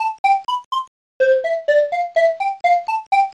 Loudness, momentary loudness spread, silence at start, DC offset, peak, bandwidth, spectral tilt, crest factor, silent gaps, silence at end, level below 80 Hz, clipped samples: -18 LUFS; 6 LU; 0 s; under 0.1%; -6 dBFS; 10.5 kHz; -0.5 dB/octave; 12 dB; 0.19-0.24 s, 0.65-0.71 s, 0.88-1.20 s, 3.07-3.11 s; 0.05 s; -68 dBFS; under 0.1%